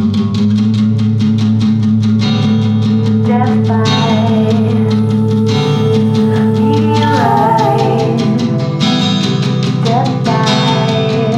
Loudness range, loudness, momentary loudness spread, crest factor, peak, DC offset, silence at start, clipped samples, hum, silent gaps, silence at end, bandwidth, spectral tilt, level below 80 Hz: 1 LU; -12 LUFS; 2 LU; 10 dB; 0 dBFS; under 0.1%; 0 s; under 0.1%; none; none; 0 s; 9.2 kHz; -7 dB/octave; -48 dBFS